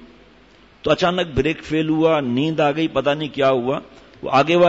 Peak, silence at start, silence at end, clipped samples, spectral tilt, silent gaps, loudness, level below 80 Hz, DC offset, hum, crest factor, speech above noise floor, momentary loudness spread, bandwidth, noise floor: -4 dBFS; 0 s; 0 s; under 0.1%; -6.5 dB/octave; none; -19 LUFS; -46 dBFS; under 0.1%; none; 14 dB; 32 dB; 6 LU; 8 kHz; -50 dBFS